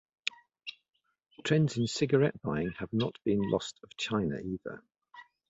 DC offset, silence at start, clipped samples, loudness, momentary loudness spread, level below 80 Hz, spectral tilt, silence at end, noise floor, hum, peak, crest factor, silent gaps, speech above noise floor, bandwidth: under 0.1%; 0.25 s; under 0.1%; -32 LUFS; 17 LU; -60 dBFS; -6 dB/octave; 0.25 s; -56 dBFS; none; -12 dBFS; 22 dB; none; 25 dB; 8 kHz